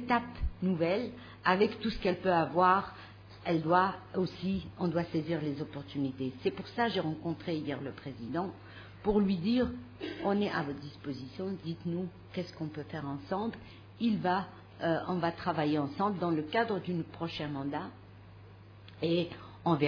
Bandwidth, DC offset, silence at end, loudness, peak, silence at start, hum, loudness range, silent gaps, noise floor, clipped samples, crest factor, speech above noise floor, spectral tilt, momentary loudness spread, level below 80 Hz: 5.4 kHz; under 0.1%; 0 s; -33 LUFS; -12 dBFS; 0 s; none; 6 LU; none; -52 dBFS; under 0.1%; 22 dB; 20 dB; -8 dB/octave; 13 LU; -52 dBFS